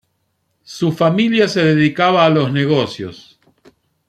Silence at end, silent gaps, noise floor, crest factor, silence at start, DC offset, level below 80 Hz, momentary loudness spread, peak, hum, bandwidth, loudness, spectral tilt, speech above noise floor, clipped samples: 0.95 s; none; -67 dBFS; 16 dB; 0.7 s; under 0.1%; -56 dBFS; 13 LU; -2 dBFS; none; 13 kHz; -15 LUFS; -6.5 dB/octave; 53 dB; under 0.1%